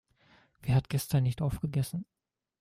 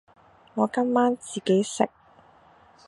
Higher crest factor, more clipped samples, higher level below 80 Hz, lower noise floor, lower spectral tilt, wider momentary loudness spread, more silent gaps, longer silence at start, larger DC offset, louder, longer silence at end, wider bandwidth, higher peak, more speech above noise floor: about the same, 16 dB vs 20 dB; neither; first, -52 dBFS vs -70 dBFS; first, -64 dBFS vs -56 dBFS; first, -6.5 dB/octave vs -5 dB/octave; first, 12 LU vs 7 LU; neither; about the same, 0.65 s vs 0.55 s; neither; second, -31 LUFS vs -25 LUFS; second, 0.55 s vs 1 s; first, 16 kHz vs 11.5 kHz; second, -16 dBFS vs -6 dBFS; about the same, 34 dB vs 32 dB